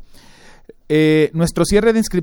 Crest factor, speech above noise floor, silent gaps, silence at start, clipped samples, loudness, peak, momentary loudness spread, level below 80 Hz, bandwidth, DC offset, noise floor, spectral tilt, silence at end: 14 dB; 29 dB; none; 0 s; under 0.1%; -15 LUFS; -2 dBFS; 4 LU; -34 dBFS; 18 kHz; under 0.1%; -43 dBFS; -6 dB/octave; 0 s